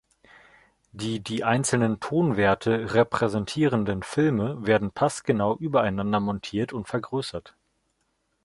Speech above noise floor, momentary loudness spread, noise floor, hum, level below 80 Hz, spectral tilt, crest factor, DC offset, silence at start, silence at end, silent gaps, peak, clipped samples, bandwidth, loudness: 49 dB; 8 LU; -73 dBFS; none; -54 dBFS; -5.5 dB/octave; 20 dB; under 0.1%; 0.95 s; 0.95 s; none; -6 dBFS; under 0.1%; 11.5 kHz; -25 LUFS